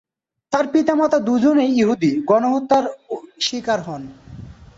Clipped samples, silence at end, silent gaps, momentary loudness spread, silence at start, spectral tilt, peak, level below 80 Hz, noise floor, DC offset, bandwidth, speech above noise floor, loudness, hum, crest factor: under 0.1%; 0.25 s; none; 17 LU; 0.5 s; -5 dB/octave; -4 dBFS; -54 dBFS; -38 dBFS; under 0.1%; 8 kHz; 20 dB; -18 LUFS; none; 16 dB